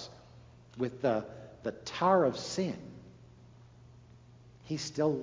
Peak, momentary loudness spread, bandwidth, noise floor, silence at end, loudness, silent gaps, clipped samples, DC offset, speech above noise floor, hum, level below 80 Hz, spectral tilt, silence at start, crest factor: -14 dBFS; 21 LU; 7.6 kHz; -56 dBFS; 0 s; -33 LUFS; none; under 0.1%; under 0.1%; 25 dB; none; -64 dBFS; -5.5 dB/octave; 0 s; 20 dB